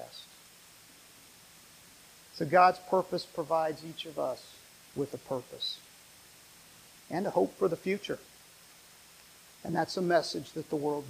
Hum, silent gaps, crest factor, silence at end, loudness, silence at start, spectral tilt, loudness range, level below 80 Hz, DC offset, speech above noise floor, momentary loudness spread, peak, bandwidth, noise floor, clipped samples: none; none; 24 dB; 0 s; -32 LUFS; 0 s; -5 dB/octave; 7 LU; -72 dBFS; under 0.1%; 25 dB; 25 LU; -10 dBFS; 15.5 kHz; -56 dBFS; under 0.1%